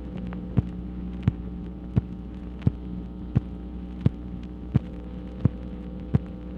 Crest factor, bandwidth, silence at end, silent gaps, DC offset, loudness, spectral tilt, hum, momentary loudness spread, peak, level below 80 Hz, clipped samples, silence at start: 22 dB; 5.2 kHz; 0 s; none; under 0.1%; -31 LUFS; -10.5 dB/octave; none; 9 LU; -6 dBFS; -38 dBFS; under 0.1%; 0 s